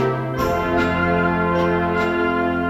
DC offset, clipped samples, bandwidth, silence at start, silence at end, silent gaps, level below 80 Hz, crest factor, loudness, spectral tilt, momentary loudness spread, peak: under 0.1%; under 0.1%; 14.5 kHz; 0 s; 0 s; none; -38 dBFS; 12 dB; -19 LUFS; -7 dB/octave; 3 LU; -8 dBFS